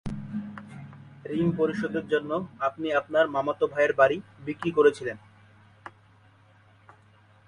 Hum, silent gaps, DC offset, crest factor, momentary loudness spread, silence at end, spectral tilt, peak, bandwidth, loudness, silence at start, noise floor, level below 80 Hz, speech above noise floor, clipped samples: none; none; under 0.1%; 22 dB; 22 LU; 1.6 s; -7 dB/octave; -6 dBFS; 10.5 kHz; -26 LUFS; 0.05 s; -58 dBFS; -58 dBFS; 32 dB; under 0.1%